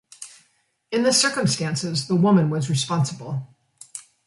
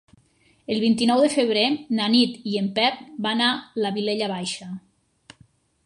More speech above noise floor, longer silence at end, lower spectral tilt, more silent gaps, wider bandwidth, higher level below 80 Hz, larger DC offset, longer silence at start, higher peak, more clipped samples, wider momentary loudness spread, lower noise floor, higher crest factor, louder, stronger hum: first, 45 dB vs 38 dB; second, 0.25 s vs 1.05 s; about the same, -4.5 dB/octave vs -4.5 dB/octave; neither; about the same, 11.5 kHz vs 11.5 kHz; about the same, -64 dBFS vs -68 dBFS; neither; second, 0.2 s vs 0.7 s; about the same, -6 dBFS vs -6 dBFS; neither; first, 21 LU vs 11 LU; first, -66 dBFS vs -60 dBFS; about the same, 18 dB vs 18 dB; about the same, -21 LUFS vs -22 LUFS; neither